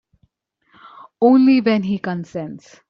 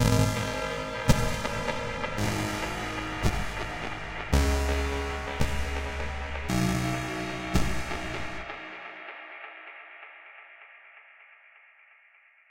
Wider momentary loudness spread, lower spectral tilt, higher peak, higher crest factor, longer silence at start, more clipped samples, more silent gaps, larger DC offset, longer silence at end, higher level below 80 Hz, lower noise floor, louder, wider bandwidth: about the same, 17 LU vs 19 LU; first, -8 dB/octave vs -5 dB/octave; first, -4 dBFS vs -8 dBFS; second, 16 dB vs 22 dB; first, 1.2 s vs 0 s; neither; neither; neither; first, 0.3 s vs 0 s; second, -62 dBFS vs -36 dBFS; first, -64 dBFS vs -60 dBFS; first, -16 LUFS vs -30 LUFS; second, 6.6 kHz vs 16 kHz